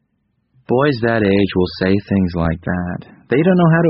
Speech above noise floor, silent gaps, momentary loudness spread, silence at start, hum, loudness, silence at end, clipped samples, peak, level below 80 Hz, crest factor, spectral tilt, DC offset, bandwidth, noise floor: 51 dB; none; 8 LU; 0.7 s; none; -17 LUFS; 0 s; under 0.1%; -2 dBFS; -40 dBFS; 14 dB; -6.5 dB/octave; under 0.1%; 5.8 kHz; -66 dBFS